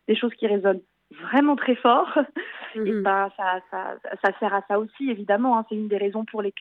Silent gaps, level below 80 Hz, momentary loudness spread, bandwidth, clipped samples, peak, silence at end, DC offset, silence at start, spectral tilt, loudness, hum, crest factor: none; -78 dBFS; 10 LU; 5 kHz; under 0.1%; -6 dBFS; 0 s; under 0.1%; 0.1 s; -7.5 dB/octave; -24 LUFS; none; 16 dB